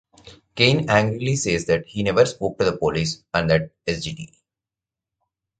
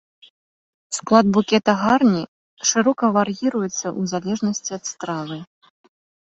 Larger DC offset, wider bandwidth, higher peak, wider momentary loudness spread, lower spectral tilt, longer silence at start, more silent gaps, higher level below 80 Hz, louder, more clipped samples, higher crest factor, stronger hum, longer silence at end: neither; first, 9.4 kHz vs 8.2 kHz; about the same, 0 dBFS vs -2 dBFS; about the same, 10 LU vs 12 LU; about the same, -5 dB/octave vs -4.5 dB/octave; second, 0.25 s vs 0.9 s; second, none vs 2.28-2.57 s; first, -46 dBFS vs -60 dBFS; about the same, -21 LUFS vs -20 LUFS; neither; about the same, 22 dB vs 18 dB; neither; first, 1.35 s vs 0.9 s